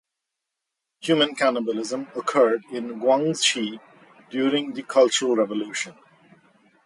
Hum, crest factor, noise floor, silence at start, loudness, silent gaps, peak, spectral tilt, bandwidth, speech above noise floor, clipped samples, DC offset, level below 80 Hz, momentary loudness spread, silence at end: none; 18 dB; -83 dBFS; 1 s; -23 LUFS; none; -6 dBFS; -3 dB/octave; 11.5 kHz; 61 dB; under 0.1%; under 0.1%; -76 dBFS; 12 LU; 0.95 s